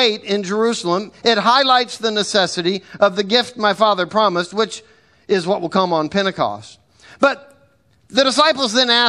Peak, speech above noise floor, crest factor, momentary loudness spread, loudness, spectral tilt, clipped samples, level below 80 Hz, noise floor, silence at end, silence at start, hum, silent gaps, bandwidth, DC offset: 0 dBFS; 39 dB; 18 dB; 8 LU; -17 LUFS; -3.5 dB/octave; under 0.1%; -62 dBFS; -56 dBFS; 0 s; 0 s; none; none; 12 kHz; under 0.1%